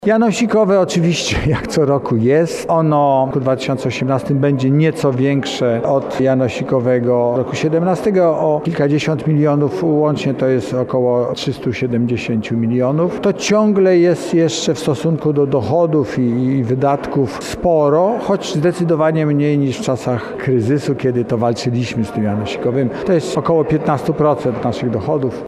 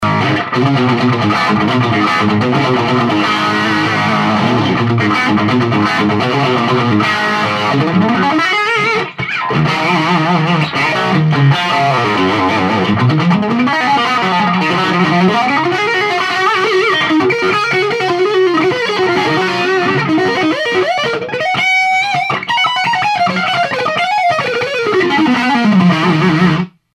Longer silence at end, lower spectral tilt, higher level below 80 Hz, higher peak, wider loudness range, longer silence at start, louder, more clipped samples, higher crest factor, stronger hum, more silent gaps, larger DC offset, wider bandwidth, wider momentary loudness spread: second, 0 s vs 0.25 s; about the same, -6.5 dB/octave vs -6 dB/octave; first, -44 dBFS vs -50 dBFS; about the same, -2 dBFS vs 0 dBFS; about the same, 2 LU vs 1 LU; about the same, 0 s vs 0 s; second, -16 LUFS vs -12 LUFS; neither; about the same, 12 dB vs 12 dB; neither; neither; neither; about the same, 13 kHz vs 13 kHz; about the same, 5 LU vs 3 LU